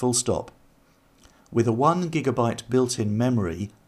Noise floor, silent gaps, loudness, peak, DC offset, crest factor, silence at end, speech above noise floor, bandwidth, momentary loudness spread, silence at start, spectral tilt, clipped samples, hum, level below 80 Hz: -59 dBFS; none; -24 LUFS; -6 dBFS; under 0.1%; 18 dB; 0.2 s; 36 dB; 15 kHz; 8 LU; 0 s; -5.5 dB/octave; under 0.1%; none; -54 dBFS